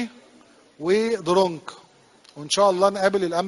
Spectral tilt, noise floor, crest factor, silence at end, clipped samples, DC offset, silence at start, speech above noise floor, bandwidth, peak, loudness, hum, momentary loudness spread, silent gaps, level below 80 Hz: -4 dB/octave; -54 dBFS; 18 dB; 0 s; under 0.1%; under 0.1%; 0 s; 33 dB; 11.5 kHz; -6 dBFS; -21 LUFS; none; 17 LU; none; -64 dBFS